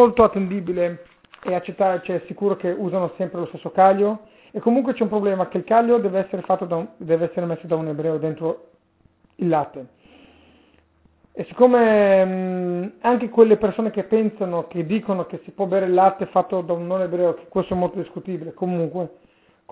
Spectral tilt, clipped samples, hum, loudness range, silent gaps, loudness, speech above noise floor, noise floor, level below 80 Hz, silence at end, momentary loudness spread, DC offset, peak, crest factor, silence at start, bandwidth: -11.5 dB/octave; under 0.1%; none; 7 LU; none; -21 LUFS; 39 dB; -60 dBFS; -56 dBFS; 0.6 s; 14 LU; under 0.1%; -2 dBFS; 20 dB; 0 s; 4 kHz